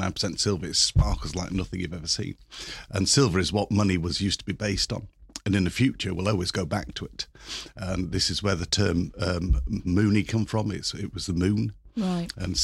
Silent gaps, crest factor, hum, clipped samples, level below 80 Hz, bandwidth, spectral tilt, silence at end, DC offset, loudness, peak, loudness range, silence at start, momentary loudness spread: none; 18 dB; none; under 0.1%; -38 dBFS; 13.5 kHz; -4.5 dB/octave; 0 s; under 0.1%; -26 LUFS; -8 dBFS; 3 LU; 0 s; 12 LU